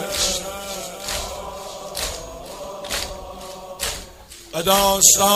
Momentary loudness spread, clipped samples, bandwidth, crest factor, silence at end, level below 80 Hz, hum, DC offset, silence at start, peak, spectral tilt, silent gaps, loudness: 21 LU; under 0.1%; 16 kHz; 22 dB; 0 s; -42 dBFS; none; under 0.1%; 0 s; 0 dBFS; -1 dB/octave; none; -20 LUFS